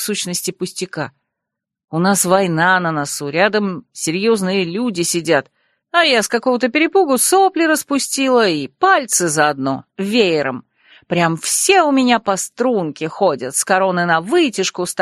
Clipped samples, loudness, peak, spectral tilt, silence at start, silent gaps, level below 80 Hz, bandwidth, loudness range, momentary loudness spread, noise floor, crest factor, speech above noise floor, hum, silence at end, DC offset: under 0.1%; -16 LUFS; 0 dBFS; -3.5 dB/octave; 0 s; 1.84-1.88 s; -62 dBFS; 13 kHz; 3 LU; 10 LU; -81 dBFS; 16 dB; 65 dB; none; 0 s; under 0.1%